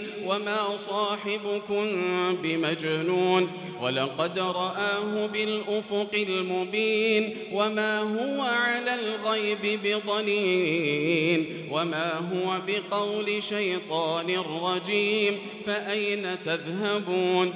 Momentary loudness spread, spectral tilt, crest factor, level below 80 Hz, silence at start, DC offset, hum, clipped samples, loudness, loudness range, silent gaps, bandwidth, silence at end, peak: 5 LU; -2.5 dB/octave; 18 dB; -76 dBFS; 0 s; under 0.1%; none; under 0.1%; -27 LUFS; 2 LU; none; 4 kHz; 0 s; -8 dBFS